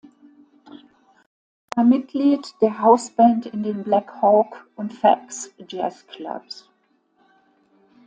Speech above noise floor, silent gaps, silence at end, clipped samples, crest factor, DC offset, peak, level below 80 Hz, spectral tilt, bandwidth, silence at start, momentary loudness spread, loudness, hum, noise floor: 45 dB; none; 1.55 s; under 0.1%; 20 dB; under 0.1%; -2 dBFS; -70 dBFS; -5.5 dB/octave; 9.4 kHz; 1.75 s; 17 LU; -20 LUFS; none; -65 dBFS